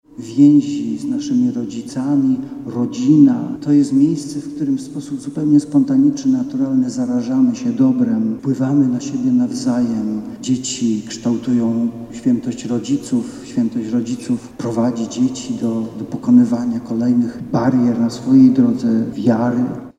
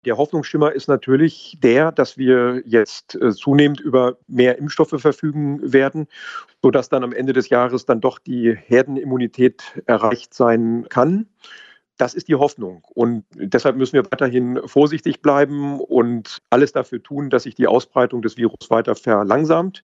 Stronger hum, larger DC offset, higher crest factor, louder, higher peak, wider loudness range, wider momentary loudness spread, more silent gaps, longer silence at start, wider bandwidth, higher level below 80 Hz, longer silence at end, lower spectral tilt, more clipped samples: neither; neither; about the same, 16 dB vs 18 dB; about the same, -17 LUFS vs -18 LUFS; about the same, 0 dBFS vs 0 dBFS; about the same, 5 LU vs 3 LU; first, 10 LU vs 7 LU; neither; about the same, 0.15 s vs 0.05 s; first, 10.5 kHz vs 7.8 kHz; first, -54 dBFS vs -64 dBFS; about the same, 0.1 s vs 0.05 s; about the same, -6.5 dB/octave vs -7 dB/octave; neither